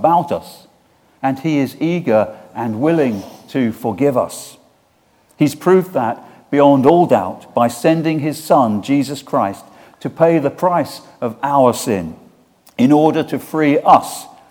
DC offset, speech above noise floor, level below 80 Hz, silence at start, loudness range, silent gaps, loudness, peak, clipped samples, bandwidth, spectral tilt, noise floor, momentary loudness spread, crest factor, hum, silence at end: under 0.1%; 41 dB; -60 dBFS; 0 s; 4 LU; none; -16 LUFS; 0 dBFS; under 0.1%; 18.5 kHz; -6.5 dB/octave; -56 dBFS; 14 LU; 16 dB; none; 0.25 s